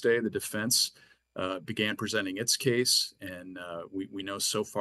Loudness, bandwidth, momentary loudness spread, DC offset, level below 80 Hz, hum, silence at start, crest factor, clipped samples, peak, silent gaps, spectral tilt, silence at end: -29 LUFS; 13 kHz; 15 LU; under 0.1%; -72 dBFS; none; 0 s; 20 dB; under 0.1%; -12 dBFS; none; -2.5 dB/octave; 0 s